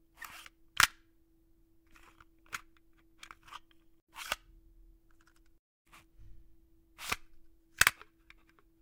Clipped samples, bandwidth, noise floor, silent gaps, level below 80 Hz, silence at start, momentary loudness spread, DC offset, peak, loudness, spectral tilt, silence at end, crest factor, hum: under 0.1%; 17.5 kHz; -67 dBFS; 4.02-4.07 s, 5.59-5.85 s; -62 dBFS; 0.2 s; 26 LU; under 0.1%; -2 dBFS; -32 LUFS; 0.5 dB/octave; 0.9 s; 38 dB; none